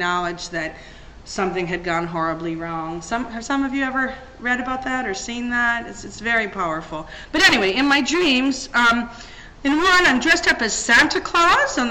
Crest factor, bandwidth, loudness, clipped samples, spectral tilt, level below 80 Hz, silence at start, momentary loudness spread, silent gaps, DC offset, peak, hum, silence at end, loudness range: 20 dB; 17 kHz; -19 LUFS; under 0.1%; -2.5 dB/octave; -44 dBFS; 0 s; 14 LU; none; under 0.1%; 0 dBFS; none; 0 s; 8 LU